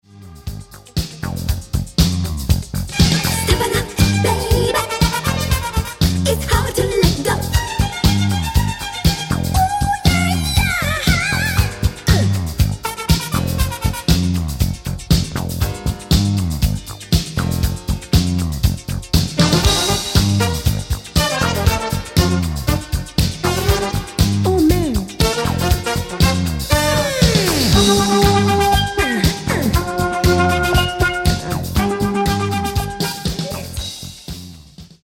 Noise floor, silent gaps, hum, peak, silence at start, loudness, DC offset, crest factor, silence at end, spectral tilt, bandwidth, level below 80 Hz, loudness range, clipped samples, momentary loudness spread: -40 dBFS; none; none; 0 dBFS; 0.15 s; -17 LUFS; under 0.1%; 16 dB; 0.15 s; -4.5 dB/octave; 17 kHz; -24 dBFS; 4 LU; under 0.1%; 8 LU